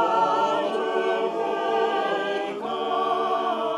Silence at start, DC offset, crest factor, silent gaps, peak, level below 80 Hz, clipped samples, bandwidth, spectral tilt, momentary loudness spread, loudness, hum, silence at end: 0 s; under 0.1%; 14 dB; none; -10 dBFS; -76 dBFS; under 0.1%; 12 kHz; -4 dB/octave; 5 LU; -24 LUFS; none; 0 s